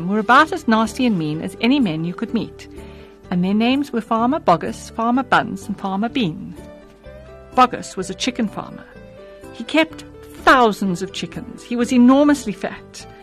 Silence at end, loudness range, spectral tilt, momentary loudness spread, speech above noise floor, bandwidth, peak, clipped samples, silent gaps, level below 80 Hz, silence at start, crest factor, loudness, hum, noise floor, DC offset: 0.1 s; 5 LU; -5.5 dB/octave; 21 LU; 22 dB; 13 kHz; -2 dBFS; under 0.1%; none; -48 dBFS; 0 s; 18 dB; -18 LUFS; none; -40 dBFS; under 0.1%